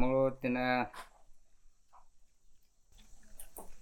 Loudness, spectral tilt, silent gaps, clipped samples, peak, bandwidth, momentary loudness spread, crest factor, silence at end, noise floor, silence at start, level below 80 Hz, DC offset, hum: -33 LUFS; -6 dB/octave; none; under 0.1%; -16 dBFS; 18 kHz; 22 LU; 20 dB; 0 s; -60 dBFS; 0 s; -54 dBFS; under 0.1%; none